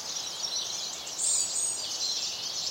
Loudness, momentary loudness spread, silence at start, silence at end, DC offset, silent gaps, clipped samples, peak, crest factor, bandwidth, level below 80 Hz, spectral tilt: -29 LUFS; 7 LU; 0 s; 0 s; under 0.1%; none; under 0.1%; -14 dBFS; 18 dB; 16 kHz; -72 dBFS; 2 dB/octave